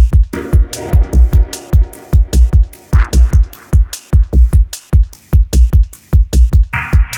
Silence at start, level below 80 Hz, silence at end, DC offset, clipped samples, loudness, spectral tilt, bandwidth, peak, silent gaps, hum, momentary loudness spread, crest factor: 0 s; -10 dBFS; 0 s; under 0.1%; under 0.1%; -13 LUFS; -6.5 dB/octave; 16 kHz; 0 dBFS; none; none; 4 LU; 10 dB